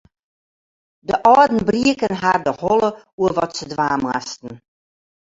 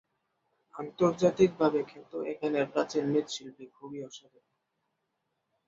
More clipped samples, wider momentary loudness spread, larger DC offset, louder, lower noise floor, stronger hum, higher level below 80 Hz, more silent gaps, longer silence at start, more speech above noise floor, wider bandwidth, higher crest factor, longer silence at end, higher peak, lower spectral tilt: neither; second, 14 LU vs 22 LU; neither; first, -18 LUFS vs -29 LUFS; first, under -90 dBFS vs -81 dBFS; neither; first, -52 dBFS vs -70 dBFS; first, 3.13-3.18 s vs none; first, 1.1 s vs 0.75 s; first, over 72 dB vs 51 dB; about the same, 7.8 kHz vs 7.8 kHz; about the same, 18 dB vs 20 dB; second, 0.75 s vs 1.5 s; first, -2 dBFS vs -10 dBFS; about the same, -5 dB/octave vs -6 dB/octave